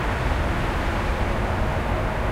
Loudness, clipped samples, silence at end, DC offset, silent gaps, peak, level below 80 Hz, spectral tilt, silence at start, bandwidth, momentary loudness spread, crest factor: -25 LUFS; under 0.1%; 0 s; under 0.1%; none; -10 dBFS; -26 dBFS; -6.5 dB/octave; 0 s; 15.5 kHz; 1 LU; 14 dB